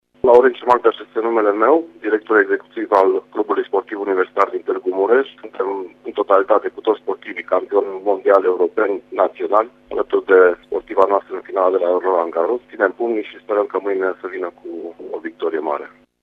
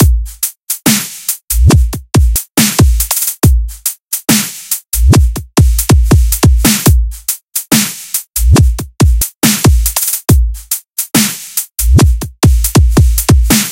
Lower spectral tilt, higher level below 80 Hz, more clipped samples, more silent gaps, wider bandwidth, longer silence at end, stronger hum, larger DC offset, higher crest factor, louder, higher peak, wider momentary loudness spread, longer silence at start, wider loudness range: first, -6 dB/octave vs -4.5 dB/octave; second, -62 dBFS vs -14 dBFS; second, under 0.1% vs 0.5%; second, none vs 4.03-4.07 s; second, 5.4 kHz vs 17.5 kHz; first, 0.35 s vs 0 s; first, 50 Hz at -65 dBFS vs none; neither; first, 18 dB vs 10 dB; second, -18 LUFS vs -11 LUFS; about the same, 0 dBFS vs 0 dBFS; first, 11 LU vs 8 LU; first, 0.25 s vs 0 s; first, 4 LU vs 1 LU